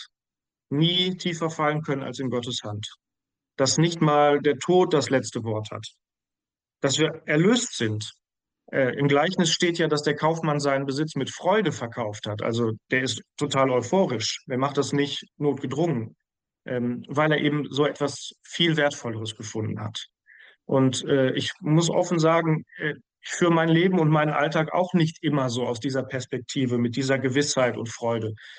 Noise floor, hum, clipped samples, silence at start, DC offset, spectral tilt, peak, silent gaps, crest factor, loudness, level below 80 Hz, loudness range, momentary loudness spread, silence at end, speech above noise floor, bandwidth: under -90 dBFS; none; under 0.1%; 0 s; under 0.1%; -5 dB/octave; -10 dBFS; none; 14 dB; -24 LUFS; -68 dBFS; 4 LU; 11 LU; 0 s; over 66 dB; 10 kHz